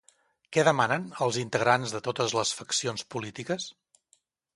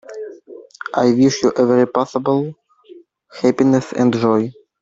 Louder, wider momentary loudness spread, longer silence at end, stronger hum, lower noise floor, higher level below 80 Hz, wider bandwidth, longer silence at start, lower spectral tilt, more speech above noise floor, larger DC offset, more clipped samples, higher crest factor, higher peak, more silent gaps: second, -28 LUFS vs -16 LUFS; second, 11 LU vs 16 LU; first, 0.85 s vs 0.3 s; neither; first, -69 dBFS vs -44 dBFS; second, -70 dBFS vs -58 dBFS; first, 11.5 kHz vs 7.8 kHz; first, 0.5 s vs 0.1 s; second, -3.5 dB/octave vs -6.5 dB/octave; first, 42 dB vs 29 dB; neither; neither; first, 24 dB vs 14 dB; second, -6 dBFS vs -2 dBFS; neither